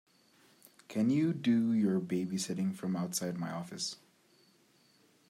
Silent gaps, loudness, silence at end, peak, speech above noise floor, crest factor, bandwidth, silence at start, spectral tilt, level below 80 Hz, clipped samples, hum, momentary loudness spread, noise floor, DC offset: none; -33 LUFS; 1.35 s; -20 dBFS; 35 dB; 16 dB; 15.5 kHz; 0.9 s; -5.5 dB/octave; -80 dBFS; under 0.1%; none; 10 LU; -67 dBFS; under 0.1%